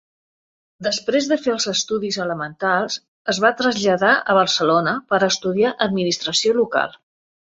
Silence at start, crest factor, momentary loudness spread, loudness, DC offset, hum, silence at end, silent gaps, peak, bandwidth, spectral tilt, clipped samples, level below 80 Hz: 0.8 s; 18 dB; 8 LU; -19 LUFS; under 0.1%; none; 0.55 s; 3.08-3.25 s; -2 dBFS; 8.2 kHz; -3 dB/octave; under 0.1%; -62 dBFS